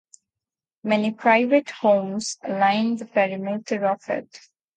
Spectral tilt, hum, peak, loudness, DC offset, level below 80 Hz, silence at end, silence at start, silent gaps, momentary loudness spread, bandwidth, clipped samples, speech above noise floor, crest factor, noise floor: -5 dB/octave; none; -4 dBFS; -22 LUFS; under 0.1%; -72 dBFS; 0.4 s; 0.85 s; none; 10 LU; 9.4 kHz; under 0.1%; 67 dB; 18 dB; -89 dBFS